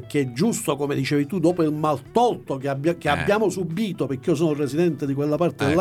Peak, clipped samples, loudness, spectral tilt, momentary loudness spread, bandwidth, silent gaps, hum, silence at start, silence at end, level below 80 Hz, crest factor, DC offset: -6 dBFS; under 0.1%; -23 LUFS; -6 dB/octave; 5 LU; 16 kHz; none; none; 0 s; 0 s; -54 dBFS; 16 dB; under 0.1%